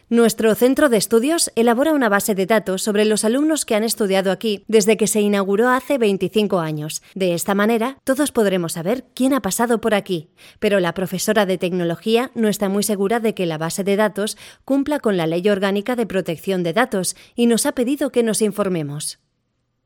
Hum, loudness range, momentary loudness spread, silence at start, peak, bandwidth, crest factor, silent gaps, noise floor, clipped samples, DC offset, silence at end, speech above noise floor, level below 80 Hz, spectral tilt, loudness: none; 3 LU; 7 LU; 0.1 s; -2 dBFS; 17.5 kHz; 18 dB; none; -70 dBFS; under 0.1%; under 0.1%; 0.7 s; 52 dB; -58 dBFS; -4.5 dB/octave; -19 LUFS